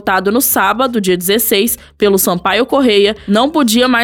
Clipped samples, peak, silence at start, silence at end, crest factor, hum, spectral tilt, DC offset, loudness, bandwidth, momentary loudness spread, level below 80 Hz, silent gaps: under 0.1%; 0 dBFS; 0.05 s; 0 s; 12 dB; none; -3.5 dB/octave; under 0.1%; -12 LUFS; 19 kHz; 3 LU; -44 dBFS; none